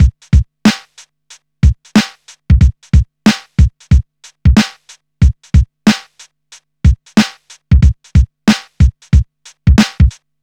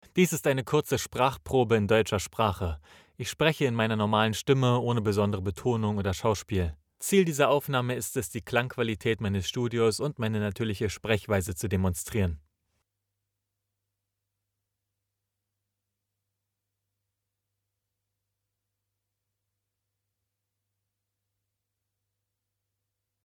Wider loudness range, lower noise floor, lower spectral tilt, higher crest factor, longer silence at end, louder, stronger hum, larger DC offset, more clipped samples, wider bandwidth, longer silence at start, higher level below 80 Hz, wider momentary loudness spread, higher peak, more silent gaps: second, 2 LU vs 6 LU; second, -45 dBFS vs -85 dBFS; about the same, -6 dB/octave vs -5.5 dB/octave; second, 12 dB vs 22 dB; second, 0.3 s vs 10.85 s; first, -13 LUFS vs -27 LUFS; neither; first, 0.2% vs under 0.1%; neither; second, 11 kHz vs 19 kHz; second, 0 s vs 0.15 s; first, -16 dBFS vs -56 dBFS; second, 4 LU vs 7 LU; first, 0 dBFS vs -8 dBFS; neither